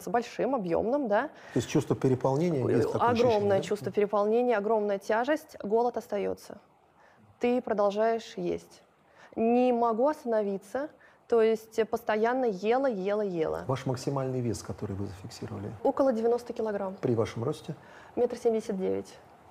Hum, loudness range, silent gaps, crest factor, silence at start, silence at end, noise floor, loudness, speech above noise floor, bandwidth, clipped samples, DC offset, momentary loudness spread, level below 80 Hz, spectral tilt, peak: none; 5 LU; none; 14 dB; 0 s; 0.3 s; -60 dBFS; -29 LUFS; 32 dB; 15 kHz; under 0.1%; under 0.1%; 11 LU; -64 dBFS; -6.5 dB/octave; -14 dBFS